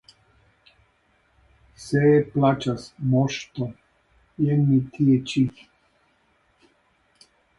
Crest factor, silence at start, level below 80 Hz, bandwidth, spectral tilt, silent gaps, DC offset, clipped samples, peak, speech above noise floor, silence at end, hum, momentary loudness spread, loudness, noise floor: 18 dB; 1.8 s; -58 dBFS; 11.5 kHz; -7.5 dB/octave; none; under 0.1%; under 0.1%; -6 dBFS; 44 dB; 2.1 s; none; 12 LU; -22 LUFS; -65 dBFS